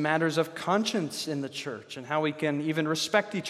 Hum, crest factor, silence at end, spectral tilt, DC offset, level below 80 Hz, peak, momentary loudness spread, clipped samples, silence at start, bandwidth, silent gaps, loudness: none; 20 dB; 0 s; -4.5 dB/octave; under 0.1%; -78 dBFS; -8 dBFS; 9 LU; under 0.1%; 0 s; 15 kHz; none; -29 LUFS